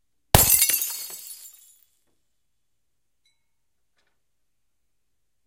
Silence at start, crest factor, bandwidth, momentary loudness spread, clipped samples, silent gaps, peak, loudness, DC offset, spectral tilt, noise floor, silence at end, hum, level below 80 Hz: 0.35 s; 28 dB; 17 kHz; 23 LU; under 0.1%; none; 0 dBFS; -18 LUFS; under 0.1%; -2 dB/octave; -81 dBFS; 4 s; none; -42 dBFS